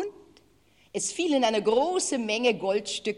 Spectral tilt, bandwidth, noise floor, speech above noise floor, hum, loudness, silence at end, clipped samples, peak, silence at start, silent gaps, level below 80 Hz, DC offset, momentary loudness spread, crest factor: -2.5 dB/octave; 12 kHz; -62 dBFS; 36 dB; none; -26 LUFS; 0 s; under 0.1%; -10 dBFS; 0 s; none; -66 dBFS; under 0.1%; 8 LU; 18 dB